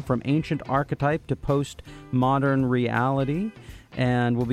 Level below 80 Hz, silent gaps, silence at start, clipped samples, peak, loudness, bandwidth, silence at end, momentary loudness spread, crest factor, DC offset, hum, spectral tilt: -46 dBFS; none; 0 s; under 0.1%; -8 dBFS; -25 LUFS; 10.5 kHz; 0 s; 7 LU; 16 dB; under 0.1%; none; -7.5 dB/octave